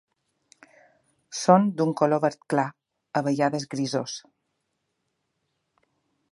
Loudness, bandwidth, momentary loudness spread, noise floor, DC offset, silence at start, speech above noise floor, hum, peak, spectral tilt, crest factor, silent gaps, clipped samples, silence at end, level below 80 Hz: -24 LUFS; 11.5 kHz; 13 LU; -78 dBFS; under 0.1%; 1.3 s; 54 dB; none; -2 dBFS; -5.5 dB/octave; 24 dB; none; under 0.1%; 2.15 s; -76 dBFS